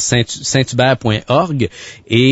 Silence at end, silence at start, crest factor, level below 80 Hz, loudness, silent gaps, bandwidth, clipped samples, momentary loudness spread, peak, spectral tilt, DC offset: 0 s; 0 s; 14 dB; -44 dBFS; -15 LUFS; none; 8 kHz; under 0.1%; 7 LU; 0 dBFS; -4.5 dB/octave; under 0.1%